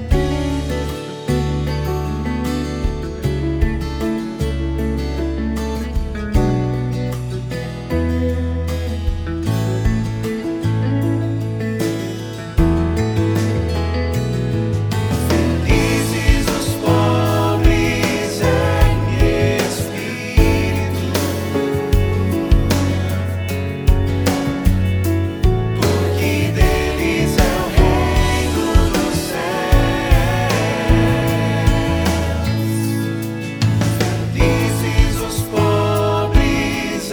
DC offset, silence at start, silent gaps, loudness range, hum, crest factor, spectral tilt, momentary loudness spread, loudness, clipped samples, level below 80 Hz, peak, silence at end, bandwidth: under 0.1%; 0 s; none; 5 LU; none; 16 dB; -6 dB/octave; 7 LU; -18 LUFS; under 0.1%; -22 dBFS; 0 dBFS; 0 s; over 20 kHz